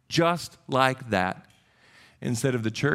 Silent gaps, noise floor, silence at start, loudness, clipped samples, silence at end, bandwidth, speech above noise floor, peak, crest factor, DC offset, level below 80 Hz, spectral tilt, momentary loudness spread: none; -58 dBFS; 0.1 s; -26 LUFS; under 0.1%; 0 s; 15.5 kHz; 33 dB; -4 dBFS; 22 dB; under 0.1%; -62 dBFS; -5 dB/octave; 9 LU